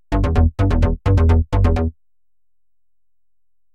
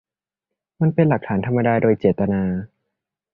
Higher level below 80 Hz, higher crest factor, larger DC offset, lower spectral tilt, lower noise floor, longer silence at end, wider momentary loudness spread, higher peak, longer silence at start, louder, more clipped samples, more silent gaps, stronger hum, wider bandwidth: first, -22 dBFS vs -48 dBFS; about the same, 14 dB vs 18 dB; neither; second, -9 dB/octave vs -12 dB/octave; about the same, -86 dBFS vs -85 dBFS; first, 1.85 s vs 0.7 s; about the same, 5 LU vs 5 LU; about the same, -4 dBFS vs -2 dBFS; second, 0.1 s vs 0.8 s; about the same, -18 LUFS vs -20 LUFS; neither; neither; neither; first, 7.2 kHz vs 4 kHz